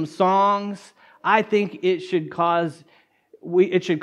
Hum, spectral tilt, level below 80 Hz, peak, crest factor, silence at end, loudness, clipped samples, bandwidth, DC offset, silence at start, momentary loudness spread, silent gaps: none; -6.5 dB/octave; -76 dBFS; -4 dBFS; 18 dB; 0 s; -21 LUFS; under 0.1%; 10.5 kHz; under 0.1%; 0 s; 11 LU; none